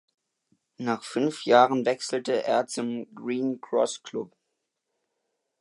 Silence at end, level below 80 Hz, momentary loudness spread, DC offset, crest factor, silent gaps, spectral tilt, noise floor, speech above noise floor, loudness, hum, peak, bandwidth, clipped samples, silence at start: 1.35 s; -82 dBFS; 15 LU; under 0.1%; 22 dB; none; -4.5 dB/octave; -81 dBFS; 55 dB; -26 LUFS; none; -6 dBFS; 11.5 kHz; under 0.1%; 0.8 s